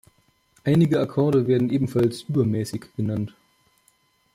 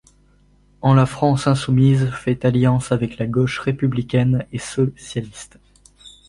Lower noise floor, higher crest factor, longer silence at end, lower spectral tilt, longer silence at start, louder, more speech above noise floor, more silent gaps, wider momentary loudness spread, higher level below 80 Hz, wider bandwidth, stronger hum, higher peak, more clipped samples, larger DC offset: first, -64 dBFS vs -55 dBFS; about the same, 14 dB vs 18 dB; first, 1.05 s vs 0.2 s; about the same, -8 dB/octave vs -7 dB/octave; second, 0.65 s vs 0.85 s; second, -23 LUFS vs -19 LUFS; first, 42 dB vs 37 dB; neither; about the same, 11 LU vs 11 LU; second, -58 dBFS vs -46 dBFS; first, 15.5 kHz vs 11.5 kHz; second, none vs 50 Hz at -45 dBFS; second, -8 dBFS vs -2 dBFS; neither; neither